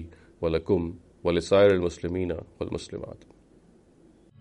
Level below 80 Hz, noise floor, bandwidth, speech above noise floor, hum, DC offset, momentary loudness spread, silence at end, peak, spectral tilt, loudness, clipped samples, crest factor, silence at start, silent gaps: -50 dBFS; -57 dBFS; 10.5 kHz; 32 dB; none; under 0.1%; 18 LU; 1.25 s; -8 dBFS; -6.5 dB/octave; -26 LUFS; under 0.1%; 20 dB; 0 s; none